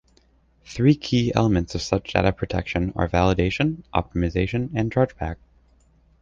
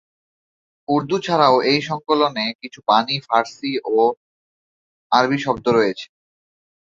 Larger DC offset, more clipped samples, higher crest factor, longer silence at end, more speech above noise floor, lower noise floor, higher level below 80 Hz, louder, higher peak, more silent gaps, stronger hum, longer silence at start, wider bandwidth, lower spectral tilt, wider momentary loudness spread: neither; neither; about the same, 20 dB vs 18 dB; about the same, 0.9 s vs 0.9 s; second, 37 dB vs over 72 dB; second, -59 dBFS vs under -90 dBFS; first, -36 dBFS vs -60 dBFS; second, -23 LUFS vs -19 LUFS; about the same, -2 dBFS vs -2 dBFS; second, none vs 2.55-2.59 s, 4.17-5.10 s; neither; second, 0.65 s vs 0.9 s; about the same, 7.6 kHz vs 7.6 kHz; first, -6.5 dB/octave vs -5 dB/octave; second, 7 LU vs 10 LU